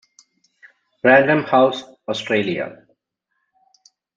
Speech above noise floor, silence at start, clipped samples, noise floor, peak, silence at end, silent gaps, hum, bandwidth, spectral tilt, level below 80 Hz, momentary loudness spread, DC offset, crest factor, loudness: 58 dB; 1.05 s; under 0.1%; -75 dBFS; 0 dBFS; 1.45 s; none; none; 7.6 kHz; -5.5 dB/octave; -66 dBFS; 14 LU; under 0.1%; 20 dB; -17 LUFS